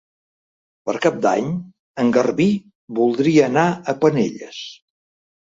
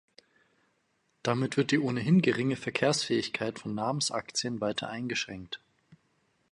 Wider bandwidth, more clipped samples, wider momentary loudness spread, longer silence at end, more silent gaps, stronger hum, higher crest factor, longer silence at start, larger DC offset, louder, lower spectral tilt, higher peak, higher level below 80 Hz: second, 7.8 kHz vs 11.5 kHz; neither; first, 16 LU vs 10 LU; first, 0.85 s vs 0.55 s; first, 1.80-1.94 s, 2.75-2.88 s vs none; neither; about the same, 18 dB vs 18 dB; second, 0.85 s vs 1.25 s; neither; first, -19 LUFS vs -30 LUFS; first, -6.5 dB/octave vs -4.5 dB/octave; first, -2 dBFS vs -12 dBFS; first, -60 dBFS vs -68 dBFS